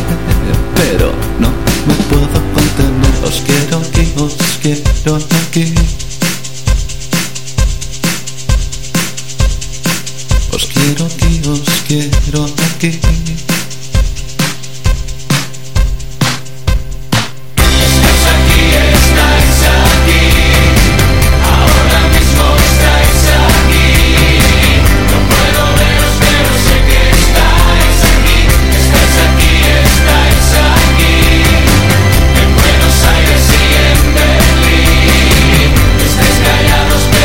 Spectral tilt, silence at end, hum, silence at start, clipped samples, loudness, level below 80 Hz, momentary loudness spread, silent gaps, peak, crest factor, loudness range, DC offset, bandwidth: -4 dB/octave; 0 s; none; 0 s; under 0.1%; -10 LUFS; -12 dBFS; 9 LU; none; 0 dBFS; 10 dB; 8 LU; 8%; 17 kHz